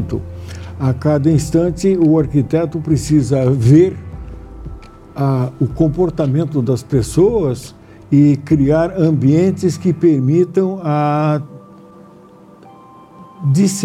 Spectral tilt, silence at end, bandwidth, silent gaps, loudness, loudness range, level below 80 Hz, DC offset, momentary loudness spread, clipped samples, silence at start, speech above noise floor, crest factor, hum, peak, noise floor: -8 dB/octave; 0 s; 13.5 kHz; none; -15 LUFS; 4 LU; -38 dBFS; under 0.1%; 18 LU; under 0.1%; 0 s; 28 dB; 14 dB; none; 0 dBFS; -42 dBFS